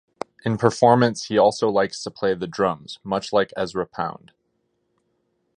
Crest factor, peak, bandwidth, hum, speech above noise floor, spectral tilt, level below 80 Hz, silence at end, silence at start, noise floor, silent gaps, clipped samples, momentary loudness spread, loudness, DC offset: 22 dB; 0 dBFS; 10.5 kHz; none; 50 dB; -5.5 dB/octave; -58 dBFS; 1.45 s; 0.45 s; -71 dBFS; none; under 0.1%; 13 LU; -22 LUFS; under 0.1%